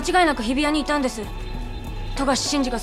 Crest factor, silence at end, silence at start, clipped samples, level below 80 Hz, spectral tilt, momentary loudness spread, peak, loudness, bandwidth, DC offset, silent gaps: 16 dB; 0 s; 0 s; under 0.1%; -32 dBFS; -3.5 dB/octave; 14 LU; -6 dBFS; -22 LUFS; 15 kHz; under 0.1%; none